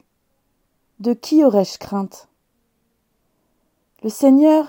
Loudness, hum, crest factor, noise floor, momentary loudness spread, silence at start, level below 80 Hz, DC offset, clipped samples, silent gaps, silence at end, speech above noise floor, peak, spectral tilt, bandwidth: -17 LUFS; none; 16 dB; -68 dBFS; 16 LU; 1 s; -66 dBFS; under 0.1%; under 0.1%; none; 0 s; 52 dB; -2 dBFS; -6.5 dB/octave; 17 kHz